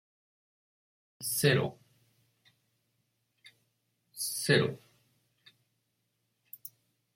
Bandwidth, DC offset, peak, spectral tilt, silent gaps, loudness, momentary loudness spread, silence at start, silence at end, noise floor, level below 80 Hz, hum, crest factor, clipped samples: 16.5 kHz; under 0.1%; -12 dBFS; -4 dB/octave; none; -30 LUFS; 23 LU; 1.2 s; 0.45 s; -80 dBFS; -72 dBFS; none; 24 dB; under 0.1%